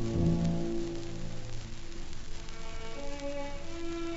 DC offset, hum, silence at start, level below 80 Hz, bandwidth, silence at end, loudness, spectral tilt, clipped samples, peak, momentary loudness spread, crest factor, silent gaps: under 0.1%; none; 0 s; -40 dBFS; 7.6 kHz; 0 s; -37 LUFS; -6.5 dB/octave; under 0.1%; -18 dBFS; 16 LU; 14 dB; none